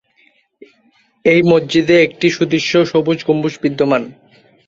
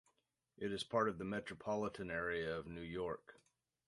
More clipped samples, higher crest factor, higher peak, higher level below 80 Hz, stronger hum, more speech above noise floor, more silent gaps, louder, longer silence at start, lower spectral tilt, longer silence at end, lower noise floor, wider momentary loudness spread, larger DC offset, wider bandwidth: neither; second, 14 dB vs 22 dB; first, -2 dBFS vs -22 dBFS; first, -56 dBFS vs -68 dBFS; neither; about the same, 41 dB vs 41 dB; neither; first, -14 LUFS vs -42 LUFS; first, 1.25 s vs 0.6 s; about the same, -6 dB/octave vs -5.5 dB/octave; about the same, 0.55 s vs 0.55 s; second, -56 dBFS vs -83 dBFS; about the same, 7 LU vs 8 LU; neither; second, 7.6 kHz vs 11.5 kHz